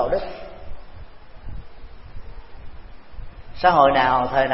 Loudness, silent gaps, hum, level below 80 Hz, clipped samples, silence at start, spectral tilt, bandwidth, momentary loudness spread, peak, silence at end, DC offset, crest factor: -18 LUFS; none; none; -38 dBFS; under 0.1%; 0 s; -9 dB/octave; 5.8 kHz; 28 LU; -2 dBFS; 0 s; under 0.1%; 20 dB